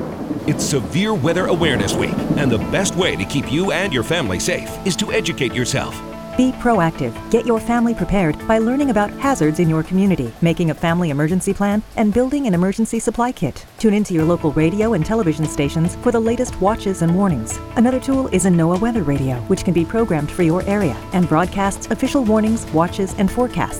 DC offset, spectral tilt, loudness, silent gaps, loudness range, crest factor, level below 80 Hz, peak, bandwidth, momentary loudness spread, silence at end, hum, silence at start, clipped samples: 0.2%; -5.5 dB/octave; -18 LUFS; none; 2 LU; 16 dB; -36 dBFS; -2 dBFS; 16.5 kHz; 4 LU; 0 s; none; 0 s; under 0.1%